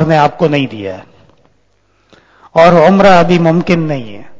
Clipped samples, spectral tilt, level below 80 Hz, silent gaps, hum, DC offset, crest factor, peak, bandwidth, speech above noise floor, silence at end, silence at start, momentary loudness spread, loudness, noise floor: 0.9%; -7 dB/octave; -44 dBFS; none; none; under 0.1%; 10 dB; 0 dBFS; 8 kHz; 47 dB; 0 s; 0 s; 16 LU; -9 LUFS; -56 dBFS